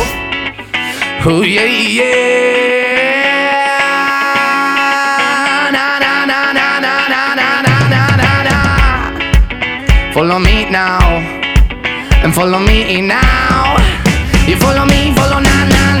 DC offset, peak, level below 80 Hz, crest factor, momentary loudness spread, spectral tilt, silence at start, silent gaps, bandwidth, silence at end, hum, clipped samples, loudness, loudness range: under 0.1%; 0 dBFS; -18 dBFS; 10 dB; 4 LU; -4.5 dB/octave; 0 s; none; 19.5 kHz; 0 s; none; under 0.1%; -11 LUFS; 1 LU